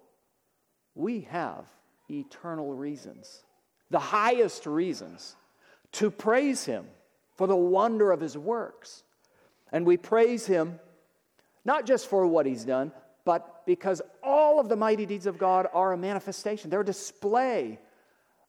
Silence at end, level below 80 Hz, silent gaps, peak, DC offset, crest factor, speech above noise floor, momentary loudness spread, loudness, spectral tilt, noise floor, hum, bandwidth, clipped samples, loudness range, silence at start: 0.7 s; -82 dBFS; none; -12 dBFS; under 0.1%; 18 dB; 48 dB; 15 LU; -27 LUFS; -5 dB/octave; -75 dBFS; none; 14.5 kHz; under 0.1%; 5 LU; 0.95 s